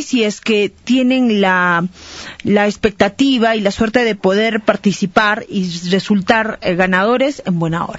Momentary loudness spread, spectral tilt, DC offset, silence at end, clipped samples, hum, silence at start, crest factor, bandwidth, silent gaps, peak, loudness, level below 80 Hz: 6 LU; -5.5 dB/octave; under 0.1%; 0 s; under 0.1%; none; 0 s; 14 dB; 8 kHz; none; 0 dBFS; -15 LUFS; -46 dBFS